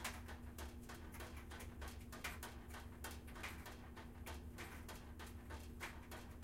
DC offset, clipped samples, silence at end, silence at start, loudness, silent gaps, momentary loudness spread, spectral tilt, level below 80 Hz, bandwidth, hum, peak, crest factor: under 0.1%; under 0.1%; 0 s; 0 s; -53 LUFS; none; 5 LU; -4 dB/octave; -56 dBFS; 16.5 kHz; none; -32 dBFS; 20 dB